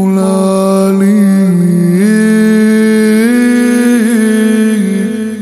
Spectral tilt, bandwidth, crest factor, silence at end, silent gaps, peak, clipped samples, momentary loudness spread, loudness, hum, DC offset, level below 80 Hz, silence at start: -6.5 dB/octave; 13.5 kHz; 8 dB; 0 s; none; 0 dBFS; under 0.1%; 2 LU; -9 LUFS; none; under 0.1%; -56 dBFS; 0 s